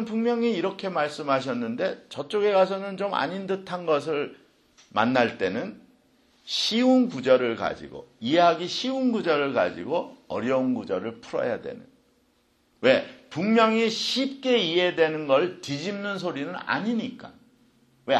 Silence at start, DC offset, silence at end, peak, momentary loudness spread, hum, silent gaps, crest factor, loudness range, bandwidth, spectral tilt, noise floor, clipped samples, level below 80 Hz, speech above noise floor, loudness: 0 s; under 0.1%; 0 s; -4 dBFS; 11 LU; none; none; 22 dB; 5 LU; 12 kHz; -5 dB/octave; -66 dBFS; under 0.1%; -68 dBFS; 41 dB; -25 LUFS